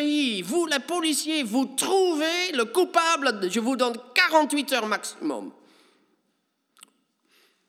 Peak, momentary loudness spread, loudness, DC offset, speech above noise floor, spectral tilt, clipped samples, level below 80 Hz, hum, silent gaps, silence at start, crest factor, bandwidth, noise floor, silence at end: -6 dBFS; 8 LU; -24 LUFS; under 0.1%; 49 dB; -2 dB/octave; under 0.1%; under -90 dBFS; none; none; 0 s; 20 dB; 16.5 kHz; -74 dBFS; 2.2 s